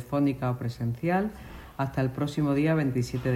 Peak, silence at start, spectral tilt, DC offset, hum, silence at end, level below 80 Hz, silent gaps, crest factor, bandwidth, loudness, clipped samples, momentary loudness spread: -14 dBFS; 0 s; -7.5 dB/octave; under 0.1%; none; 0 s; -50 dBFS; none; 14 dB; 16 kHz; -28 LUFS; under 0.1%; 9 LU